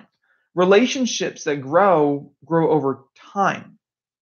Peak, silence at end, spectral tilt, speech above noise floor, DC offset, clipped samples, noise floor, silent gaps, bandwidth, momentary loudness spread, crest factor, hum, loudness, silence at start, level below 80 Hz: -4 dBFS; 0.6 s; -5 dB/octave; 45 dB; under 0.1%; under 0.1%; -64 dBFS; none; 7.2 kHz; 14 LU; 16 dB; none; -19 LUFS; 0.55 s; -74 dBFS